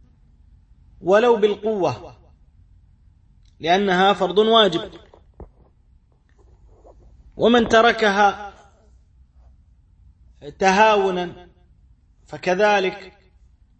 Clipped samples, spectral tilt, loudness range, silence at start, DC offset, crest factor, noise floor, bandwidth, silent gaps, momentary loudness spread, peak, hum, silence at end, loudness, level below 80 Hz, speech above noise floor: under 0.1%; -4.5 dB/octave; 3 LU; 1 s; under 0.1%; 18 dB; -56 dBFS; 8.6 kHz; none; 19 LU; -2 dBFS; none; 0.7 s; -18 LUFS; -50 dBFS; 38 dB